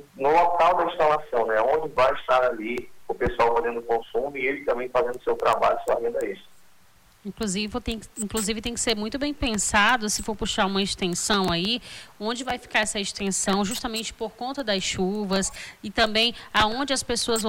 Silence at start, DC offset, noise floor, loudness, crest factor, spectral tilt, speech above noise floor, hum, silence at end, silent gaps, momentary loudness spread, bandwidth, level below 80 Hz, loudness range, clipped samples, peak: 0.15 s; under 0.1%; -57 dBFS; -24 LUFS; 16 dB; -3 dB/octave; 33 dB; none; 0 s; none; 10 LU; 18 kHz; -46 dBFS; 4 LU; under 0.1%; -10 dBFS